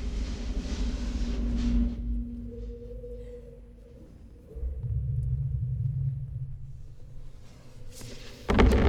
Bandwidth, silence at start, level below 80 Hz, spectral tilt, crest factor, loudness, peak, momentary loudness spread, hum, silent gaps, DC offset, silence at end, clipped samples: 10 kHz; 0 s; -32 dBFS; -7 dB/octave; 24 dB; -32 LUFS; -6 dBFS; 22 LU; none; none; under 0.1%; 0 s; under 0.1%